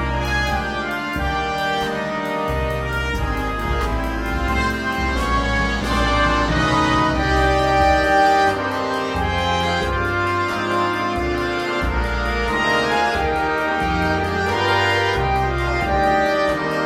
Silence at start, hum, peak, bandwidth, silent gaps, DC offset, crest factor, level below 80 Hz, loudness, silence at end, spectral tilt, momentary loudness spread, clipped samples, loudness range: 0 s; none; -4 dBFS; 15.5 kHz; none; under 0.1%; 14 dB; -28 dBFS; -19 LUFS; 0 s; -5 dB/octave; 6 LU; under 0.1%; 5 LU